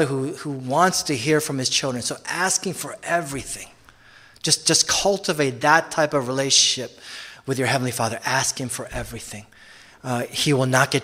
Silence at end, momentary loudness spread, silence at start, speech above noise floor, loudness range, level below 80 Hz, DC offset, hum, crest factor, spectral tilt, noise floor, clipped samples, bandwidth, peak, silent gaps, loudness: 0 s; 16 LU; 0 s; 28 dB; 6 LU; -52 dBFS; under 0.1%; none; 22 dB; -2.5 dB/octave; -50 dBFS; under 0.1%; 16 kHz; 0 dBFS; none; -21 LUFS